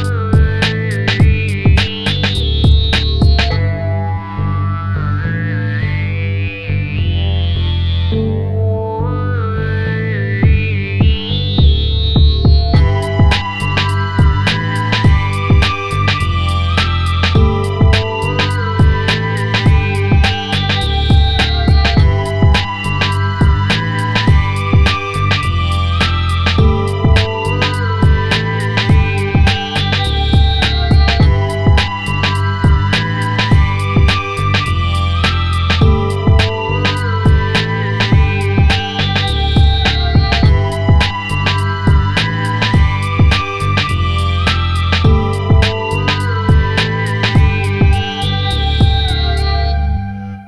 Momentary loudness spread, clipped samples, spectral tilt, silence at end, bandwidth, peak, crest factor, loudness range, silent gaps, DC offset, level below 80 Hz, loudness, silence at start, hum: 5 LU; under 0.1%; -6 dB/octave; 0 s; 11 kHz; 0 dBFS; 12 dB; 3 LU; none; under 0.1%; -18 dBFS; -14 LUFS; 0 s; none